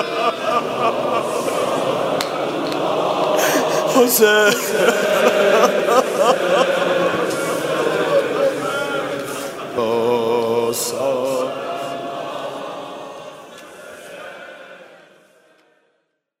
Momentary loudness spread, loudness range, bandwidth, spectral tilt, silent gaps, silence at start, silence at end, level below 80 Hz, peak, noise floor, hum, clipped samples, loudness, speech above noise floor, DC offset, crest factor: 20 LU; 16 LU; 16 kHz; -3 dB/octave; none; 0 s; 1.45 s; -64 dBFS; 0 dBFS; -69 dBFS; none; under 0.1%; -18 LUFS; 53 dB; under 0.1%; 18 dB